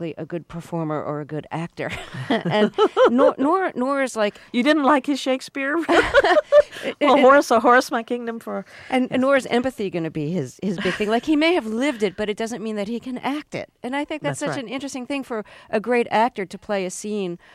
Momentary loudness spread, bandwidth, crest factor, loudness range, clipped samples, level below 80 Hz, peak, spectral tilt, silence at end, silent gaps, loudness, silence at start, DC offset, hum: 14 LU; 15 kHz; 16 dB; 9 LU; under 0.1%; -52 dBFS; -4 dBFS; -5 dB/octave; 0.2 s; none; -21 LUFS; 0 s; under 0.1%; none